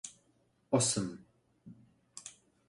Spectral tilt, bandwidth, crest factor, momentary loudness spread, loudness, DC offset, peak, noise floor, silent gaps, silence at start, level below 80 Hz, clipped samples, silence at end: -4 dB/octave; 11.5 kHz; 22 dB; 23 LU; -32 LUFS; under 0.1%; -16 dBFS; -72 dBFS; none; 0.05 s; -70 dBFS; under 0.1%; 0.4 s